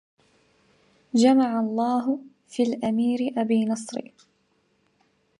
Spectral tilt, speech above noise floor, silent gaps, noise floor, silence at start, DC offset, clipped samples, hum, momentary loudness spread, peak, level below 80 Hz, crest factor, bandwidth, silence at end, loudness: -5.5 dB/octave; 45 dB; none; -68 dBFS; 1.15 s; under 0.1%; under 0.1%; none; 13 LU; -6 dBFS; -72 dBFS; 18 dB; 11 kHz; 1.4 s; -24 LUFS